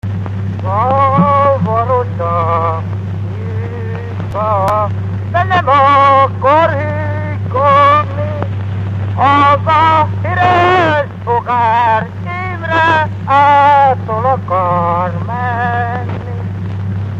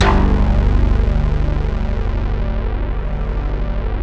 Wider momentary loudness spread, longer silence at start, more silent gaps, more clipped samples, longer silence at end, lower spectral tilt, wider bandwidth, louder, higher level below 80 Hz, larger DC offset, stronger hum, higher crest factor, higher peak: first, 12 LU vs 7 LU; about the same, 0.05 s vs 0 s; neither; neither; about the same, 0 s vs 0 s; about the same, -7.5 dB/octave vs -7.5 dB/octave; first, 7 kHz vs 6.2 kHz; first, -12 LUFS vs -19 LUFS; second, -42 dBFS vs -16 dBFS; second, under 0.1% vs 0.4%; second, none vs 50 Hz at -25 dBFS; about the same, 12 dB vs 14 dB; about the same, 0 dBFS vs 0 dBFS